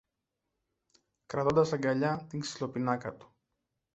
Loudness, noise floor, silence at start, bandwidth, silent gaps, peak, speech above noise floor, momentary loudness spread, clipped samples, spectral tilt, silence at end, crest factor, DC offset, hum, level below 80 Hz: -31 LUFS; -86 dBFS; 1.3 s; 8.2 kHz; none; -12 dBFS; 55 dB; 11 LU; under 0.1%; -6 dB/octave; 0.75 s; 20 dB; under 0.1%; none; -64 dBFS